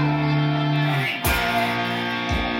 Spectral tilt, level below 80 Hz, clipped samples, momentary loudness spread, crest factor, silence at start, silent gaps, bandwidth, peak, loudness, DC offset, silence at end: -5.5 dB/octave; -36 dBFS; under 0.1%; 3 LU; 14 dB; 0 s; none; 16 kHz; -8 dBFS; -22 LUFS; under 0.1%; 0 s